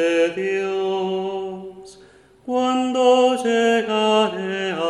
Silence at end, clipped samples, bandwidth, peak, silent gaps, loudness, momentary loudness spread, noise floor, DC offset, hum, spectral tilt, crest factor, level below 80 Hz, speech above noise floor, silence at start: 0 s; under 0.1%; 11.5 kHz; -4 dBFS; none; -20 LUFS; 13 LU; -49 dBFS; under 0.1%; none; -4.5 dB/octave; 16 dB; -64 dBFS; 30 dB; 0 s